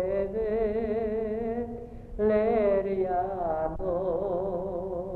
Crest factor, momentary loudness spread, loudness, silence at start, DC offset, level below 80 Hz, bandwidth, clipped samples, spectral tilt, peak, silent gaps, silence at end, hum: 14 dB; 9 LU; -29 LUFS; 0 s; under 0.1%; -44 dBFS; 4.4 kHz; under 0.1%; -10 dB/octave; -14 dBFS; none; 0 s; none